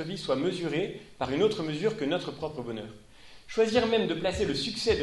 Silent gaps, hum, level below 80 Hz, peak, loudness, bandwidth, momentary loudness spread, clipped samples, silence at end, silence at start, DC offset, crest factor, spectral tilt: none; none; -52 dBFS; -12 dBFS; -29 LUFS; 11.5 kHz; 11 LU; under 0.1%; 0 s; 0 s; under 0.1%; 18 dB; -5 dB/octave